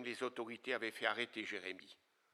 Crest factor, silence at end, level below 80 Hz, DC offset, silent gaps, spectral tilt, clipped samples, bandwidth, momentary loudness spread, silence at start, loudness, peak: 26 dB; 0.4 s; under -90 dBFS; under 0.1%; none; -3 dB/octave; under 0.1%; 14.5 kHz; 11 LU; 0 s; -42 LUFS; -18 dBFS